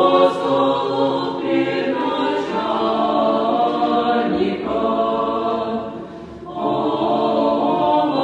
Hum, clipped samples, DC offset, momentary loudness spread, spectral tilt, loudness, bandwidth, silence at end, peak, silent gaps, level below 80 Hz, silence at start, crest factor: none; under 0.1%; under 0.1%; 6 LU; -6.5 dB/octave; -19 LUFS; 9.2 kHz; 0 s; -4 dBFS; none; -54 dBFS; 0 s; 14 dB